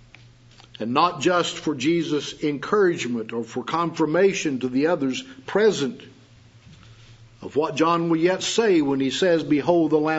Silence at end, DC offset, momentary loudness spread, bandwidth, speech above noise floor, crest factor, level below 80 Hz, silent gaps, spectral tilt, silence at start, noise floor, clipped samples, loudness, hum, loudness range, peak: 0 s; under 0.1%; 9 LU; 8 kHz; 29 dB; 18 dB; -62 dBFS; none; -5 dB/octave; 0.8 s; -51 dBFS; under 0.1%; -22 LUFS; none; 3 LU; -4 dBFS